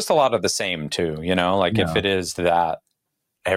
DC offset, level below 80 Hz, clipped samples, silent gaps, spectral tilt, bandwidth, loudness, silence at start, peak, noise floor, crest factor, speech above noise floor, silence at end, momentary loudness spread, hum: under 0.1%; -50 dBFS; under 0.1%; none; -4 dB/octave; 16.5 kHz; -21 LUFS; 0 s; -2 dBFS; -78 dBFS; 20 dB; 57 dB; 0 s; 6 LU; none